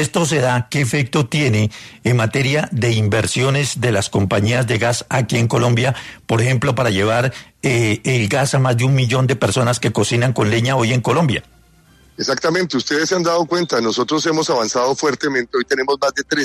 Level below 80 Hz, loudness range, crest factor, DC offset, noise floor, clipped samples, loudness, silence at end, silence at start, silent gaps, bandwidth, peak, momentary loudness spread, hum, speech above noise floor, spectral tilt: -50 dBFS; 2 LU; 14 dB; under 0.1%; -50 dBFS; under 0.1%; -17 LUFS; 0 s; 0 s; none; 13.5 kHz; -4 dBFS; 3 LU; none; 33 dB; -5 dB/octave